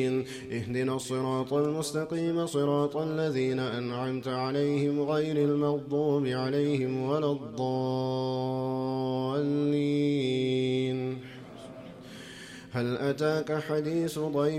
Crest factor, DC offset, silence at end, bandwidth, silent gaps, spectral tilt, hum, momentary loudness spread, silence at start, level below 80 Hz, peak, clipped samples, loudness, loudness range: 14 dB; under 0.1%; 0 s; 15 kHz; none; -6.5 dB/octave; none; 9 LU; 0 s; -66 dBFS; -16 dBFS; under 0.1%; -29 LUFS; 4 LU